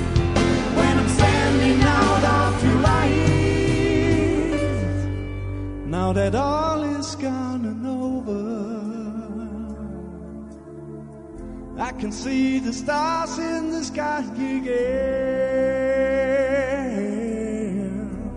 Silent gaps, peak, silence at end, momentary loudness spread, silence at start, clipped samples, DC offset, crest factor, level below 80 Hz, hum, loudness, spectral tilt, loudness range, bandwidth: none; -4 dBFS; 0 s; 15 LU; 0 s; under 0.1%; under 0.1%; 18 dB; -34 dBFS; none; -22 LUFS; -6 dB/octave; 12 LU; 10.5 kHz